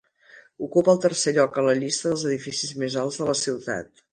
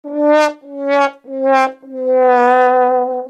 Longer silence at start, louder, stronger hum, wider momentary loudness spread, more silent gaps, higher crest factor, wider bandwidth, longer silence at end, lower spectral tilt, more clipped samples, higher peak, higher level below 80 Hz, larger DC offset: first, 0.35 s vs 0.05 s; second, -23 LUFS vs -13 LUFS; neither; about the same, 9 LU vs 9 LU; neither; first, 18 dB vs 12 dB; about the same, 10 kHz vs 9.8 kHz; first, 0.3 s vs 0 s; about the same, -4 dB/octave vs -3 dB/octave; neither; second, -6 dBFS vs -2 dBFS; first, -64 dBFS vs -76 dBFS; neither